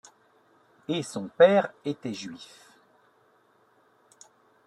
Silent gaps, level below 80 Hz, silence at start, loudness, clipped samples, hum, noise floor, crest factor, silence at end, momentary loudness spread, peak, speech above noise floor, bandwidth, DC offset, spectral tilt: none; -76 dBFS; 0.9 s; -25 LUFS; under 0.1%; none; -64 dBFS; 24 dB; 2.2 s; 25 LU; -6 dBFS; 39 dB; 11.5 kHz; under 0.1%; -5 dB/octave